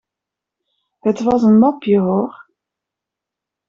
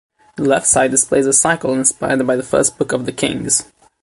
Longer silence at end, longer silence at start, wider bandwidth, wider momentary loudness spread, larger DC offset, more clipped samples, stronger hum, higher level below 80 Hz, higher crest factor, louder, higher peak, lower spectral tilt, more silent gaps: first, 1.4 s vs 0.4 s; first, 1.05 s vs 0.35 s; second, 7.2 kHz vs 12 kHz; about the same, 10 LU vs 8 LU; neither; neither; neither; second, -56 dBFS vs -48 dBFS; about the same, 16 dB vs 16 dB; about the same, -15 LUFS vs -15 LUFS; about the same, -2 dBFS vs 0 dBFS; first, -8.5 dB/octave vs -3 dB/octave; neither